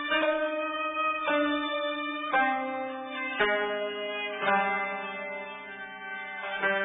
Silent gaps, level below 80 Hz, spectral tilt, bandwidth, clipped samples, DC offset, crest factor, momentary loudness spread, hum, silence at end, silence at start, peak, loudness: none; -68 dBFS; -7 dB/octave; 3.9 kHz; under 0.1%; under 0.1%; 18 dB; 11 LU; none; 0 s; 0 s; -12 dBFS; -29 LUFS